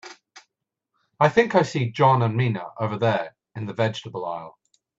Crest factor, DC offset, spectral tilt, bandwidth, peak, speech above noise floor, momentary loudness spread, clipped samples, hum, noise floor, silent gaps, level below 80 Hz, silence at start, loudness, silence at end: 22 dB; under 0.1%; -6.5 dB/octave; 7.8 kHz; -2 dBFS; 59 dB; 15 LU; under 0.1%; none; -81 dBFS; none; -64 dBFS; 0.05 s; -23 LUFS; 0.5 s